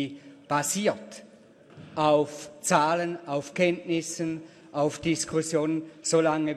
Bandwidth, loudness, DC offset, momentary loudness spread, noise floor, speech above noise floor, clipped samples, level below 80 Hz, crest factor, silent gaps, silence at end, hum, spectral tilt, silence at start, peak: 13.5 kHz; -27 LUFS; under 0.1%; 14 LU; -53 dBFS; 26 dB; under 0.1%; -66 dBFS; 20 dB; none; 0 s; none; -4.5 dB/octave; 0 s; -6 dBFS